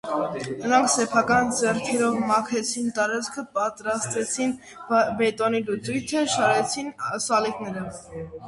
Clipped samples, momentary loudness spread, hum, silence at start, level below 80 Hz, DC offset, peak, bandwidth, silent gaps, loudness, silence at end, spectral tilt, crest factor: under 0.1%; 9 LU; none; 0.05 s; -58 dBFS; under 0.1%; -6 dBFS; 11.5 kHz; none; -24 LUFS; 0 s; -3.5 dB/octave; 18 dB